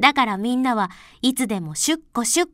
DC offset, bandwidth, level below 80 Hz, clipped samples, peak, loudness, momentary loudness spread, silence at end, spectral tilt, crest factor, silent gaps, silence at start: under 0.1%; 16 kHz; -56 dBFS; under 0.1%; 0 dBFS; -22 LUFS; 5 LU; 0.05 s; -2.5 dB/octave; 22 dB; none; 0 s